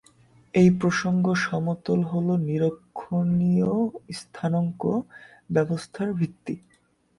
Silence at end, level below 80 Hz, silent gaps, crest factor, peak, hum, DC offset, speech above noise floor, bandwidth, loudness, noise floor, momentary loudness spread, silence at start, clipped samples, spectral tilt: 0.6 s; -60 dBFS; none; 16 dB; -8 dBFS; none; under 0.1%; 33 dB; 11 kHz; -25 LUFS; -57 dBFS; 15 LU; 0.55 s; under 0.1%; -7.5 dB/octave